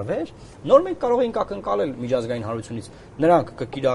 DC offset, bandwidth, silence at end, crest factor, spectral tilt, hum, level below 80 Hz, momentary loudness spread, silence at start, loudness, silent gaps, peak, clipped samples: under 0.1%; 11.5 kHz; 0 s; 20 dB; -7 dB/octave; none; -52 dBFS; 17 LU; 0 s; -22 LUFS; none; -2 dBFS; under 0.1%